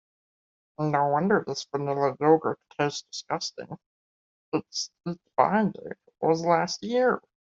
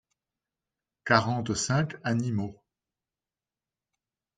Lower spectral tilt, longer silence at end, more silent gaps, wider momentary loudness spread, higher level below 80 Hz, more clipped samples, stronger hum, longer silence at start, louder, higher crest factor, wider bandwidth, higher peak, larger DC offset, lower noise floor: about the same, -5 dB/octave vs -5 dB/octave; second, 0.35 s vs 1.85 s; first, 3.86-4.52 s vs none; about the same, 12 LU vs 11 LU; second, -70 dBFS vs -64 dBFS; neither; neither; second, 0.8 s vs 1.05 s; about the same, -27 LUFS vs -27 LUFS; about the same, 22 dB vs 26 dB; second, 7.8 kHz vs 9.4 kHz; about the same, -6 dBFS vs -6 dBFS; neither; about the same, under -90 dBFS vs under -90 dBFS